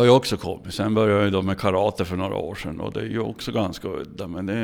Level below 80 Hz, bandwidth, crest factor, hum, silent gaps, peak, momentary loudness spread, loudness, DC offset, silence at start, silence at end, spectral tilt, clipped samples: -50 dBFS; 17.5 kHz; 18 dB; none; none; -4 dBFS; 12 LU; -24 LUFS; under 0.1%; 0 s; 0 s; -6 dB/octave; under 0.1%